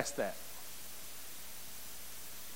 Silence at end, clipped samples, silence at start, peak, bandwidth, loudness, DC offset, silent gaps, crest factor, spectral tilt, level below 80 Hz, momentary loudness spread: 0 s; under 0.1%; 0 s; -20 dBFS; 17 kHz; -45 LUFS; 0.6%; none; 26 dB; -2 dB/octave; -66 dBFS; 7 LU